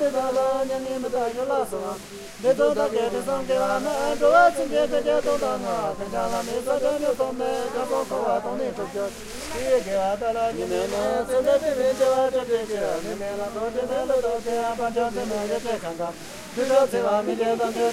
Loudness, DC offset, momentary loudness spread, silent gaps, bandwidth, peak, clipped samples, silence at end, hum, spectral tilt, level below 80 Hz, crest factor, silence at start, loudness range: -24 LUFS; under 0.1%; 9 LU; none; 16 kHz; -4 dBFS; under 0.1%; 0 s; none; -4 dB/octave; -50 dBFS; 18 dB; 0 s; 4 LU